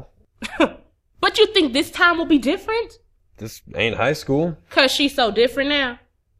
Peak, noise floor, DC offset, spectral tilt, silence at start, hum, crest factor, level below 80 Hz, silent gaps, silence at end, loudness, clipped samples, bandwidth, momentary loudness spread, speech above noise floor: 0 dBFS; -48 dBFS; under 0.1%; -4 dB/octave; 0 s; none; 20 dB; -48 dBFS; none; 0.45 s; -19 LUFS; under 0.1%; 15.5 kHz; 17 LU; 29 dB